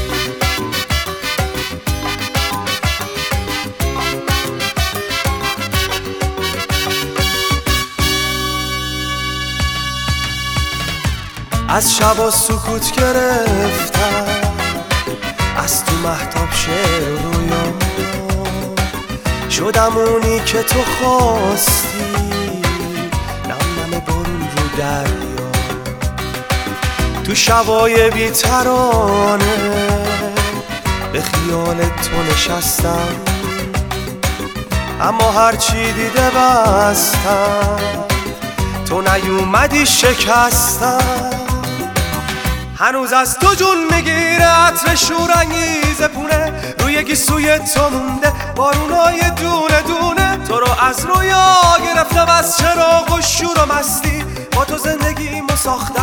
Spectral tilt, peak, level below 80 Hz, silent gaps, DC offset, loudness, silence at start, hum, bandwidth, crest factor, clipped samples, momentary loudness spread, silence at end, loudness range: -3.5 dB/octave; 0 dBFS; -26 dBFS; none; under 0.1%; -15 LUFS; 0 s; none; over 20 kHz; 14 dB; under 0.1%; 9 LU; 0 s; 6 LU